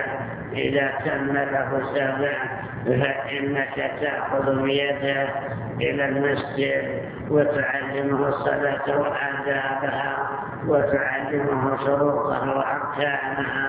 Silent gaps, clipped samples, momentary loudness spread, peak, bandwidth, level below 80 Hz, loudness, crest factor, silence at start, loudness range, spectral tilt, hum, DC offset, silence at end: none; under 0.1%; 5 LU; -6 dBFS; 4 kHz; -52 dBFS; -24 LUFS; 18 dB; 0 s; 1 LU; -9.5 dB/octave; none; under 0.1%; 0 s